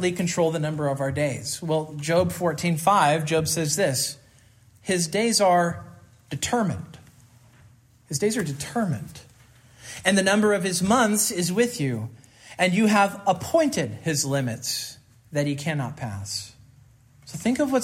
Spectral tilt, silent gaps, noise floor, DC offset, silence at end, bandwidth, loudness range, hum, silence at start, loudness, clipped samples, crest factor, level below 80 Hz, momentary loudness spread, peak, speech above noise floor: -4 dB/octave; none; -55 dBFS; under 0.1%; 0 s; 16 kHz; 7 LU; none; 0 s; -24 LUFS; under 0.1%; 18 dB; -60 dBFS; 14 LU; -6 dBFS; 32 dB